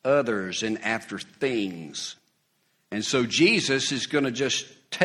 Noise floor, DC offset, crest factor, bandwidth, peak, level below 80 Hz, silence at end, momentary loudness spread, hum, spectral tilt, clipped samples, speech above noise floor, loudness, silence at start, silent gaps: -70 dBFS; under 0.1%; 24 dB; 12.5 kHz; -2 dBFS; -66 dBFS; 0 s; 14 LU; none; -3.5 dB/octave; under 0.1%; 44 dB; -25 LUFS; 0.05 s; none